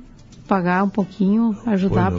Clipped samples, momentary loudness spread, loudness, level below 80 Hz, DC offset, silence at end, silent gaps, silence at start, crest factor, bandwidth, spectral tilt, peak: under 0.1%; 4 LU; -20 LUFS; -44 dBFS; under 0.1%; 0 s; none; 0 s; 16 dB; 7.2 kHz; -9 dB/octave; -4 dBFS